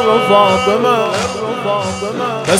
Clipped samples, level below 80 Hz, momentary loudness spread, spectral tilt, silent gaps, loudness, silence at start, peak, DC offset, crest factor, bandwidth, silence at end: under 0.1%; -48 dBFS; 9 LU; -4 dB/octave; none; -14 LUFS; 0 s; 0 dBFS; under 0.1%; 14 dB; 16.5 kHz; 0 s